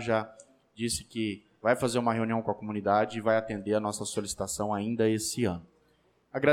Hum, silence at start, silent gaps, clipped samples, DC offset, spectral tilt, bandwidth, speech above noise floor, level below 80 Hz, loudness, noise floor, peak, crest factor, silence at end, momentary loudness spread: none; 0 s; none; under 0.1%; under 0.1%; -4.5 dB/octave; 16.5 kHz; 38 dB; -60 dBFS; -30 LUFS; -68 dBFS; -12 dBFS; 18 dB; 0 s; 7 LU